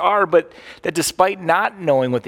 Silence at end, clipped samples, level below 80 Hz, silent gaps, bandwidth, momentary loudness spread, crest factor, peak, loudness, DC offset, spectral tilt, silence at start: 0 s; under 0.1%; -58 dBFS; none; 17.5 kHz; 9 LU; 16 dB; -2 dBFS; -18 LUFS; under 0.1%; -4 dB/octave; 0 s